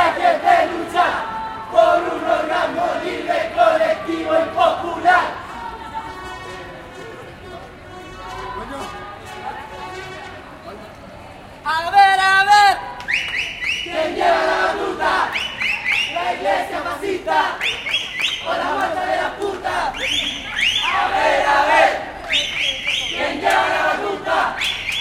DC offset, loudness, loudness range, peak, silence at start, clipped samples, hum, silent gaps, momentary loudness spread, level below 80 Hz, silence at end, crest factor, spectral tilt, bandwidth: under 0.1%; -18 LUFS; 15 LU; -2 dBFS; 0 s; under 0.1%; none; none; 19 LU; -48 dBFS; 0 s; 18 dB; -2.5 dB/octave; 16 kHz